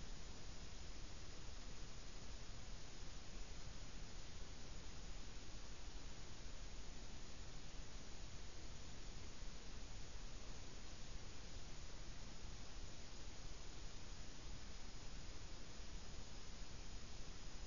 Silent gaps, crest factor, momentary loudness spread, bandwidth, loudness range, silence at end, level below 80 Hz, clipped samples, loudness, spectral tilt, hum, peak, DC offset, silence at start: none; 12 dB; 1 LU; 7.2 kHz; 0 LU; 0 s; -56 dBFS; under 0.1%; -57 LUFS; -3.5 dB/octave; none; -38 dBFS; 0.3%; 0 s